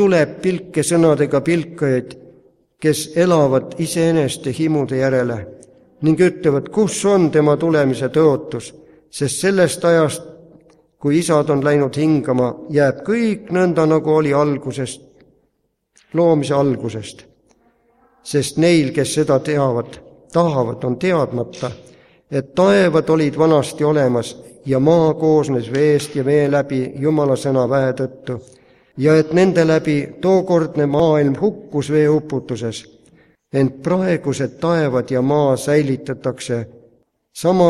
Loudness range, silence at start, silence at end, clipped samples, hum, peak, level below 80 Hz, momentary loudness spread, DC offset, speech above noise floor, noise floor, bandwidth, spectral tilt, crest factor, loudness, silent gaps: 3 LU; 0 s; 0 s; under 0.1%; none; -2 dBFS; -54 dBFS; 11 LU; under 0.1%; 52 dB; -68 dBFS; 14.5 kHz; -6 dB/octave; 16 dB; -17 LUFS; none